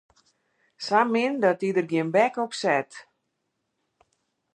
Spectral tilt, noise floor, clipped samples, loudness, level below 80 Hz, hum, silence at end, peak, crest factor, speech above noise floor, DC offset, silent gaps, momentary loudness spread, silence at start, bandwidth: -5 dB/octave; -78 dBFS; under 0.1%; -24 LUFS; -80 dBFS; none; 1.55 s; -6 dBFS; 20 dB; 55 dB; under 0.1%; none; 5 LU; 0.8 s; 11 kHz